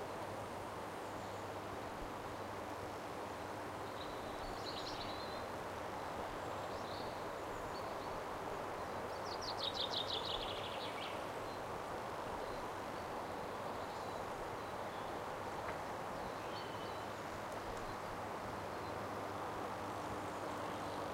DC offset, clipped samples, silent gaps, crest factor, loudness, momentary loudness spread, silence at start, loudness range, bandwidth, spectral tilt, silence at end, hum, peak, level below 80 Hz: under 0.1%; under 0.1%; none; 16 dB; -44 LUFS; 4 LU; 0 s; 4 LU; 16 kHz; -4 dB/octave; 0 s; none; -28 dBFS; -62 dBFS